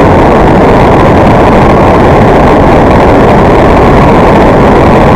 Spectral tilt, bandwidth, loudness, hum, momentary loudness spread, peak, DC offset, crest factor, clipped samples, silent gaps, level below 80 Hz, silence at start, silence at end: -8 dB/octave; 17 kHz; -3 LUFS; none; 0 LU; 0 dBFS; 1%; 2 dB; 40%; none; -14 dBFS; 0 s; 0 s